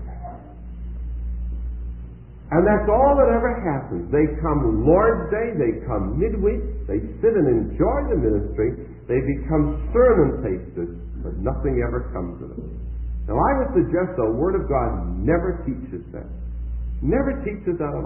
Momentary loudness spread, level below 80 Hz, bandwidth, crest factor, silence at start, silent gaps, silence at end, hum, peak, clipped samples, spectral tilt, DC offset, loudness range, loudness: 17 LU; -30 dBFS; 3 kHz; 18 dB; 0 s; none; 0 s; none; -4 dBFS; under 0.1%; -14 dB/octave; 0.1%; 5 LU; -22 LUFS